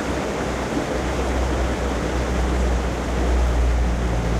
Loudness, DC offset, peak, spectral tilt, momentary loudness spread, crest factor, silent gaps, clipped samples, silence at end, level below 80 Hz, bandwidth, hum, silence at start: -23 LUFS; under 0.1%; -10 dBFS; -6 dB/octave; 3 LU; 12 dB; none; under 0.1%; 0 s; -24 dBFS; 12.5 kHz; none; 0 s